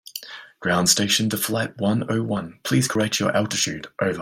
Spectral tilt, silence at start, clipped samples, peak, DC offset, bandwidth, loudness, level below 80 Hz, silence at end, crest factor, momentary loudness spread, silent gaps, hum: -3.5 dB/octave; 0.05 s; under 0.1%; -2 dBFS; under 0.1%; 16.5 kHz; -22 LUFS; -58 dBFS; 0 s; 20 dB; 10 LU; none; none